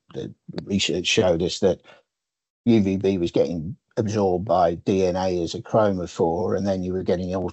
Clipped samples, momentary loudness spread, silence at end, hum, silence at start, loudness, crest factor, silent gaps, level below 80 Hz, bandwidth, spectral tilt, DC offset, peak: under 0.1%; 9 LU; 0 s; none; 0.15 s; -23 LUFS; 16 dB; 2.50-2.64 s; -46 dBFS; 8.4 kHz; -5.5 dB/octave; under 0.1%; -6 dBFS